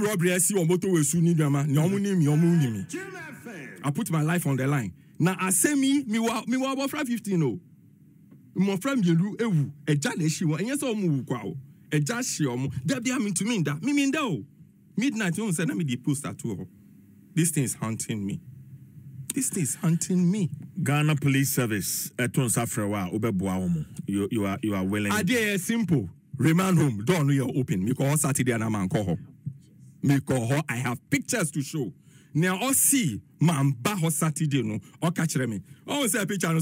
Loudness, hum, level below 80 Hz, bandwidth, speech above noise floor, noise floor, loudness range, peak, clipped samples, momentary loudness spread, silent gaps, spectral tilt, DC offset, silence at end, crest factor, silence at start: -26 LUFS; none; -64 dBFS; 16 kHz; 29 dB; -54 dBFS; 4 LU; -8 dBFS; under 0.1%; 10 LU; none; -5 dB/octave; under 0.1%; 0 s; 16 dB; 0 s